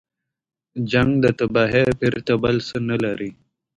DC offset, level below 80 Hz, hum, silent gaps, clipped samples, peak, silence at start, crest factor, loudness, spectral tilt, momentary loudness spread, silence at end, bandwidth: under 0.1%; -46 dBFS; none; none; under 0.1%; -4 dBFS; 0.75 s; 16 dB; -20 LUFS; -7 dB/octave; 12 LU; 0.45 s; 10.5 kHz